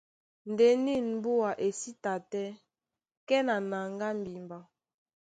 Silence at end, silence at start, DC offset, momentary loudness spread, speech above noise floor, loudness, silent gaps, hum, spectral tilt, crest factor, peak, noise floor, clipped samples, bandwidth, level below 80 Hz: 0.75 s; 0.45 s; under 0.1%; 17 LU; over 60 dB; -30 LUFS; 3.17-3.27 s; none; -5 dB/octave; 18 dB; -14 dBFS; under -90 dBFS; under 0.1%; 9.4 kHz; -74 dBFS